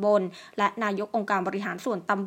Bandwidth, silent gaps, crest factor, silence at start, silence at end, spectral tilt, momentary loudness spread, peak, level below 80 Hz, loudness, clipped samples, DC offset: 16 kHz; none; 18 dB; 0 s; 0 s; -6 dB/octave; 5 LU; -8 dBFS; -78 dBFS; -28 LUFS; under 0.1%; under 0.1%